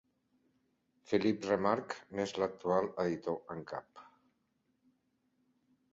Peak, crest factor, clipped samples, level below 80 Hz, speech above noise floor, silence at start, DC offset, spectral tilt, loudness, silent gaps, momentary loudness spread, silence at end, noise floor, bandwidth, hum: -16 dBFS; 22 dB; under 0.1%; -72 dBFS; 44 dB; 1.1 s; under 0.1%; -5 dB/octave; -35 LUFS; none; 11 LU; 1.9 s; -79 dBFS; 7.6 kHz; none